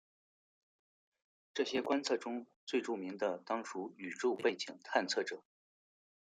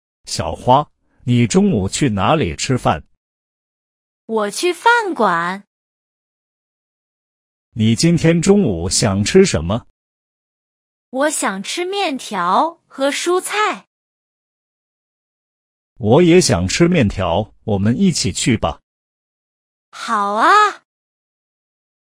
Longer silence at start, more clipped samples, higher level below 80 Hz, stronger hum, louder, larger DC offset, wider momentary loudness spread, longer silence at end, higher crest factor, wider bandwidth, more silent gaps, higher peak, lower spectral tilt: first, 1.55 s vs 0.25 s; neither; second, under -90 dBFS vs -44 dBFS; neither; second, -38 LUFS vs -16 LUFS; neither; about the same, 10 LU vs 11 LU; second, 0.85 s vs 1.4 s; first, 24 dB vs 18 dB; second, 9.6 kHz vs 15.5 kHz; second, 2.56-2.67 s vs 3.17-4.28 s, 5.67-7.72 s, 9.90-11.12 s, 13.87-15.96 s, 18.83-19.92 s; second, -16 dBFS vs 0 dBFS; second, -3 dB/octave vs -5 dB/octave